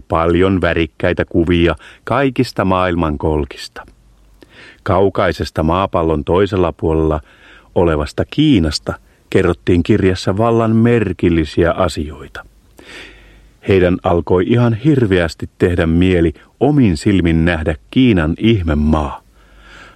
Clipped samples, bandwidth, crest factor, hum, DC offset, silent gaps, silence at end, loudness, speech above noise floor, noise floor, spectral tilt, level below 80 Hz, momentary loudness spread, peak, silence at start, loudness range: under 0.1%; 12.5 kHz; 14 dB; none; under 0.1%; none; 0.1 s; -15 LUFS; 32 dB; -46 dBFS; -7.5 dB/octave; -30 dBFS; 11 LU; 0 dBFS; 0.1 s; 4 LU